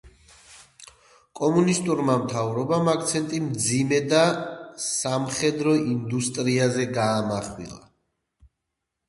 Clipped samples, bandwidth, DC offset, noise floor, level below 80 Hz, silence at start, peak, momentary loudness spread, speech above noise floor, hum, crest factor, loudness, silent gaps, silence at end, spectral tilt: under 0.1%; 11.5 kHz; under 0.1%; -82 dBFS; -58 dBFS; 0.05 s; -6 dBFS; 9 LU; 59 dB; none; 18 dB; -23 LUFS; none; 1.3 s; -4.5 dB/octave